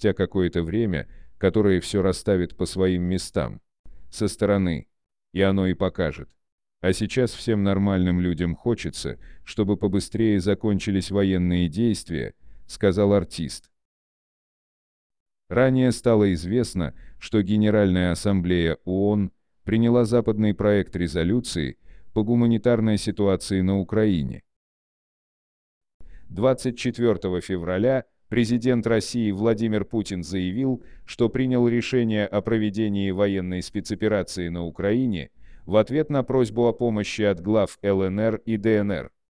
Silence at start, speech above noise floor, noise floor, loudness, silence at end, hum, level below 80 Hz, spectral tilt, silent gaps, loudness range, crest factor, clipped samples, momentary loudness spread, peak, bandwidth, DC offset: 0 s; over 68 dB; under -90 dBFS; -23 LUFS; 0.3 s; none; -46 dBFS; -6.5 dB/octave; 3.79-3.84 s, 6.52-6.58 s, 13.85-15.10 s, 15.20-15.26 s, 24.56-25.81 s, 25.94-26.00 s; 4 LU; 16 dB; under 0.1%; 9 LU; -8 dBFS; 10.5 kHz; 0.3%